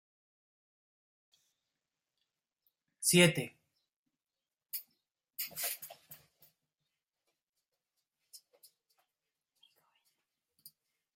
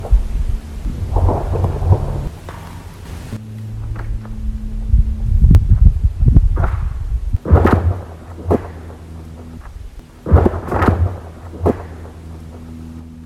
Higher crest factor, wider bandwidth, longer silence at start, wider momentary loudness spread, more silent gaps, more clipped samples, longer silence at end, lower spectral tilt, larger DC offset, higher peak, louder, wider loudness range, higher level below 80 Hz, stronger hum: first, 30 dB vs 16 dB; first, 16.5 kHz vs 11.5 kHz; first, 3 s vs 0 s; first, 24 LU vs 20 LU; first, 3.96-4.06 s, 7.49-7.53 s vs none; second, under 0.1% vs 0.1%; first, 2.8 s vs 0 s; second, -3.5 dB/octave vs -9 dB/octave; neither; second, -10 dBFS vs 0 dBFS; second, -32 LUFS vs -17 LUFS; first, 11 LU vs 8 LU; second, -80 dBFS vs -20 dBFS; neither